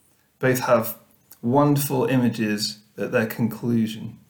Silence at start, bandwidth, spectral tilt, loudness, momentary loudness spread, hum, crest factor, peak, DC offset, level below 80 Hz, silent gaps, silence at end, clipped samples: 0.4 s; over 20 kHz; -5.5 dB/octave; -23 LUFS; 10 LU; none; 18 dB; -6 dBFS; under 0.1%; -64 dBFS; none; 0.15 s; under 0.1%